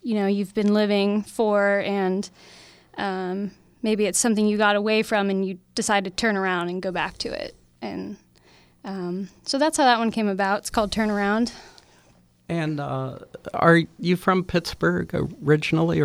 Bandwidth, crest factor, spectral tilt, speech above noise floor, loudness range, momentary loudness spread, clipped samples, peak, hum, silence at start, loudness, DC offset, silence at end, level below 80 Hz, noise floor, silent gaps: 14.5 kHz; 20 dB; -5 dB/octave; 35 dB; 4 LU; 14 LU; under 0.1%; -4 dBFS; none; 0.05 s; -23 LUFS; under 0.1%; 0 s; -52 dBFS; -57 dBFS; none